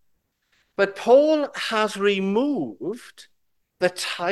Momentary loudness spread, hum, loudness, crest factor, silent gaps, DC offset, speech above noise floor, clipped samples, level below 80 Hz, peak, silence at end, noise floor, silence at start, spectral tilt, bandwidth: 16 LU; none; -22 LUFS; 18 dB; none; under 0.1%; 49 dB; under 0.1%; -72 dBFS; -6 dBFS; 0 s; -71 dBFS; 0.8 s; -4.5 dB/octave; 12.5 kHz